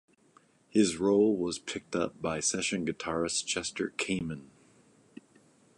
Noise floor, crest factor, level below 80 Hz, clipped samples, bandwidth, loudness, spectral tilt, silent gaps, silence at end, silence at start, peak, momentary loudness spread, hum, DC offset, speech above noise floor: -64 dBFS; 20 dB; -62 dBFS; under 0.1%; 11.5 kHz; -30 LUFS; -3.5 dB/octave; none; 1.3 s; 0.75 s; -12 dBFS; 9 LU; none; under 0.1%; 34 dB